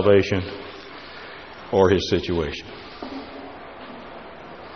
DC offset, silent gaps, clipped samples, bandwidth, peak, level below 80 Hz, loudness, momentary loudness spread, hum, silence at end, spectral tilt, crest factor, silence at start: 0.2%; none; under 0.1%; 6.6 kHz; -4 dBFS; -48 dBFS; -22 LUFS; 20 LU; none; 0 s; -4.5 dB/octave; 22 dB; 0 s